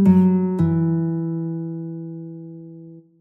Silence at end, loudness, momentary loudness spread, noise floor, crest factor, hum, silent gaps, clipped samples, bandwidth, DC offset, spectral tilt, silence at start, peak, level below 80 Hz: 0.2 s; -21 LUFS; 22 LU; -42 dBFS; 16 dB; none; none; under 0.1%; 2.7 kHz; under 0.1%; -11.5 dB/octave; 0 s; -4 dBFS; -56 dBFS